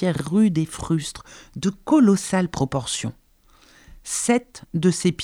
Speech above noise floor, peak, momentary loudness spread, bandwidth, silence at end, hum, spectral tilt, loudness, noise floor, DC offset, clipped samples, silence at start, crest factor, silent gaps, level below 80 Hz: 34 dB; -6 dBFS; 15 LU; 15 kHz; 0 s; none; -5.5 dB/octave; -22 LUFS; -55 dBFS; under 0.1%; under 0.1%; 0 s; 18 dB; none; -50 dBFS